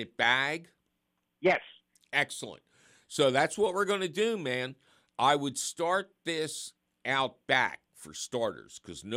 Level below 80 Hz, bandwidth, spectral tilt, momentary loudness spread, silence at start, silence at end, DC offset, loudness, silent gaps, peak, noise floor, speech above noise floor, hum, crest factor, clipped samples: -72 dBFS; 16 kHz; -3 dB/octave; 16 LU; 0 s; 0 s; under 0.1%; -30 LUFS; none; -10 dBFS; -80 dBFS; 50 dB; none; 22 dB; under 0.1%